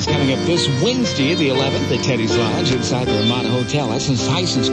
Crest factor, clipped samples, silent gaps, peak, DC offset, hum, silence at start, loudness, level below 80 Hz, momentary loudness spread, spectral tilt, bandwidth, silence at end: 12 dB; under 0.1%; none; -4 dBFS; under 0.1%; none; 0 s; -17 LUFS; -42 dBFS; 2 LU; -5 dB/octave; 10 kHz; 0 s